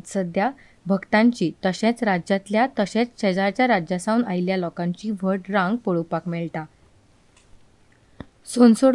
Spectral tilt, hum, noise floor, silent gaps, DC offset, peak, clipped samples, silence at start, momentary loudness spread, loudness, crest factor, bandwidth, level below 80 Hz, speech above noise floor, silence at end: -6 dB/octave; none; -56 dBFS; none; under 0.1%; -4 dBFS; under 0.1%; 0.05 s; 10 LU; -22 LUFS; 18 dB; 11.5 kHz; -60 dBFS; 35 dB; 0 s